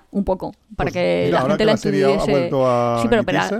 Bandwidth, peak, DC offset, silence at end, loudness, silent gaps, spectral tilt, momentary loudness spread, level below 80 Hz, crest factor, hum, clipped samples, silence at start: 14.5 kHz; -2 dBFS; under 0.1%; 0 s; -18 LUFS; none; -6 dB/octave; 7 LU; -40 dBFS; 16 dB; none; under 0.1%; 0.15 s